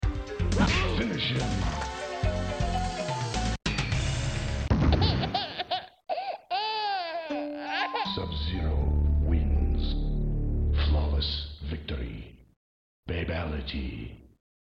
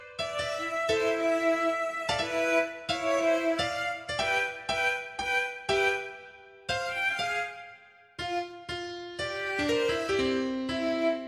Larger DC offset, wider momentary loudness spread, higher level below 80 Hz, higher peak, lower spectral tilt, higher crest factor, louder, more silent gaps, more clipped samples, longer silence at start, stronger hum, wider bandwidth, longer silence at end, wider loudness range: neither; about the same, 9 LU vs 11 LU; first, -32 dBFS vs -58 dBFS; first, -10 dBFS vs -14 dBFS; first, -5.5 dB/octave vs -3.5 dB/octave; about the same, 18 dB vs 16 dB; about the same, -29 LUFS vs -29 LUFS; first, 12.56-13.03 s vs none; neither; about the same, 0 s vs 0 s; neither; second, 9.2 kHz vs 15.5 kHz; first, 0.5 s vs 0 s; about the same, 3 LU vs 4 LU